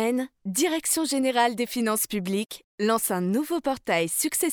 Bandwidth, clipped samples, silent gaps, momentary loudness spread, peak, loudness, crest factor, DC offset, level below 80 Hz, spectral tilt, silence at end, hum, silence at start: over 20 kHz; under 0.1%; 2.64-2.78 s; 6 LU; -10 dBFS; -25 LUFS; 16 dB; under 0.1%; -66 dBFS; -3.5 dB/octave; 0 s; none; 0 s